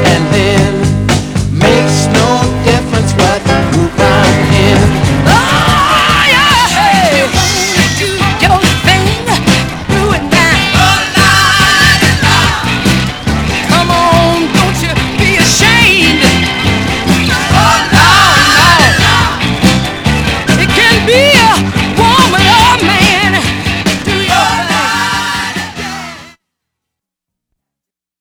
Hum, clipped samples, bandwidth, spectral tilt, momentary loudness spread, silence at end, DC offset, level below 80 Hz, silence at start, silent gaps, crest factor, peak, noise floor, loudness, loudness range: none; 1%; over 20 kHz; -4 dB/octave; 7 LU; 1.9 s; under 0.1%; -24 dBFS; 0 s; none; 8 dB; 0 dBFS; -82 dBFS; -8 LUFS; 4 LU